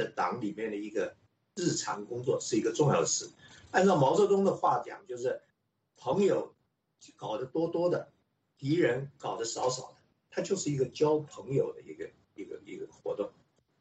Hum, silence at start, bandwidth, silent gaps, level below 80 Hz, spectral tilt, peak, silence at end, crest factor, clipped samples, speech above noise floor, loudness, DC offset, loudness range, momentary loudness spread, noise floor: none; 0 s; 8.4 kHz; none; -72 dBFS; -5 dB/octave; -12 dBFS; 0.5 s; 18 dB; under 0.1%; 45 dB; -31 LUFS; under 0.1%; 6 LU; 18 LU; -76 dBFS